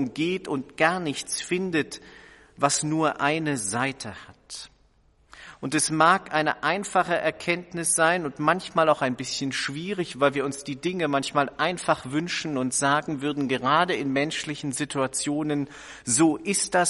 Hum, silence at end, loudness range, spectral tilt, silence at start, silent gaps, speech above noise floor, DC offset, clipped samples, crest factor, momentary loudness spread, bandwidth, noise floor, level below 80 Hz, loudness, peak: none; 0 s; 3 LU; -3.5 dB/octave; 0 s; none; 36 dB; under 0.1%; under 0.1%; 22 dB; 9 LU; 11.5 kHz; -61 dBFS; -62 dBFS; -25 LUFS; -4 dBFS